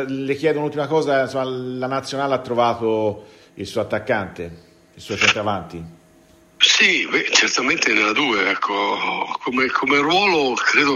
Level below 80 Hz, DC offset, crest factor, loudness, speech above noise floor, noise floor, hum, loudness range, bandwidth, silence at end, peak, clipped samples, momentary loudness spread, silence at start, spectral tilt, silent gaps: -58 dBFS; under 0.1%; 20 dB; -18 LUFS; 32 dB; -52 dBFS; none; 7 LU; 14 kHz; 0 s; 0 dBFS; under 0.1%; 12 LU; 0 s; -2.5 dB/octave; none